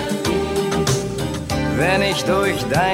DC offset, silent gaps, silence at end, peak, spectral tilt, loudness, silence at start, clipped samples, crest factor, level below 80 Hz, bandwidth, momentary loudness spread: under 0.1%; none; 0 s; -4 dBFS; -4.5 dB/octave; -19 LUFS; 0 s; under 0.1%; 14 dB; -36 dBFS; 16.5 kHz; 6 LU